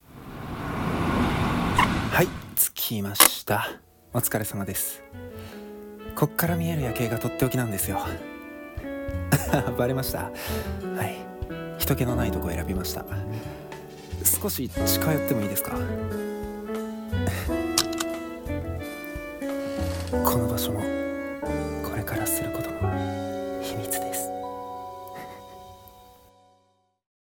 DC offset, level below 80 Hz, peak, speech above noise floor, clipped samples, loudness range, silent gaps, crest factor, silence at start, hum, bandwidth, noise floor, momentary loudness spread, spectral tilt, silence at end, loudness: under 0.1%; -42 dBFS; 0 dBFS; 41 dB; under 0.1%; 7 LU; none; 28 dB; 0.1 s; none; 18 kHz; -67 dBFS; 16 LU; -4 dB/octave; 1.1 s; -27 LUFS